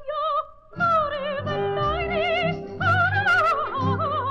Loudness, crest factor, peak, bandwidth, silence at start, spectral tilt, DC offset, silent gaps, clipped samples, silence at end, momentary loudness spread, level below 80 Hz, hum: -23 LUFS; 12 dB; -10 dBFS; 9.6 kHz; 0 s; -6.5 dB/octave; under 0.1%; none; under 0.1%; 0 s; 8 LU; -46 dBFS; none